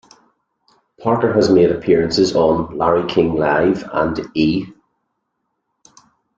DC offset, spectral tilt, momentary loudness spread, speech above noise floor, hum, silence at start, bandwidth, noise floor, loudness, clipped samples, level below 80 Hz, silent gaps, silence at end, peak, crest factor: under 0.1%; -6 dB/octave; 7 LU; 58 dB; none; 1 s; 7.8 kHz; -73 dBFS; -16 LUFS; under 0.1%; -46 dBFS; none; 1.65 s; -2 dBFS; 16 dB